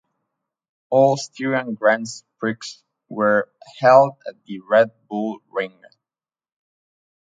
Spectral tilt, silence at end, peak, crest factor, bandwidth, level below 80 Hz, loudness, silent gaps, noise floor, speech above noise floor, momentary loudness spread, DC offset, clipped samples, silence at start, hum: -5.5 dB/octave; 1.55 s; 0 dBFS; 20 dB; 9.2 kHz; -74 dBFS; -19 LUFS; none; under -90 dBFS; over 71 dB; 20 LU; under 0.1%; under 0.1%; 0.9 s; none